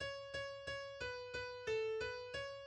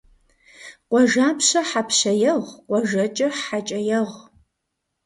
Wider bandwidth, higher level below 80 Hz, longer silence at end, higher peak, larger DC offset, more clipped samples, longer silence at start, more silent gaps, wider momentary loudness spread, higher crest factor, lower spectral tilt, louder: second, 9.8 kHz vs 11.5 kHz; about the same, -66 dBFS vs -64 dBFS; second, 0 s vs 0.85 s; second, -30 dBFS vs -6 dBFS; neither; neither; second, 0 s vs 0.6 s; neither; about the same, 6 LU vs 8 LU; about the same, 14 dB vs 16 dB; about the same, -3 dB/octave vs -3 dB/octave; second, -44 LUFS vs -20 LUFS